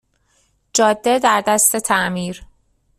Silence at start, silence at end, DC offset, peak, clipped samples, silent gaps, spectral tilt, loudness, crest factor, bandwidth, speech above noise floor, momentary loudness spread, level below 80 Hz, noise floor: 0.75 s; 0.55 s; under 0.1%; 0 dBFS; under 0.1%; none; -2.5 dB/octave; -16 LUFS; 18 dB; 15.5 kHz; 45 dB; 12 LU; -52 dBFS; -62 dBFS